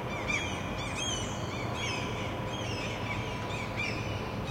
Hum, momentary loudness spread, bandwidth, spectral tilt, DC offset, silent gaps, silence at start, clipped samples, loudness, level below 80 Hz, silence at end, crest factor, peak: none; 4 LU; 16.5 kHz; -4 dB/octave; under 0.1%; none; 0 s; under 0.1%; -34 LUFS; -48 dBFS; 0 s; 16 dB; -18 dBFS